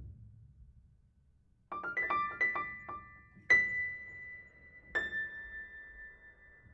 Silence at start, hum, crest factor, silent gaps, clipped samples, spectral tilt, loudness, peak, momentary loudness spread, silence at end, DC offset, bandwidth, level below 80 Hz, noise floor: 0 s; none; 22 dB; none; under 0.1%; -3.5 dB/octave; -33 LUFS; -16 dBFS; 24 LU; 0 s; under 0.1%; 7.8 kHz; -64 dBFS; -68 dBFS